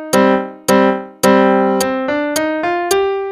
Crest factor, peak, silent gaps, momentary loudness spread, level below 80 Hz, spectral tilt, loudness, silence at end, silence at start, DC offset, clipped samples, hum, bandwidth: 14 dB; 0 dBFS; none; 6 LU; -50 dBFS; -4.5 dB/octave; -14 LUFS; 0 s; 0 s; under 0.1%; under 0.1%; none; 15.5 kHz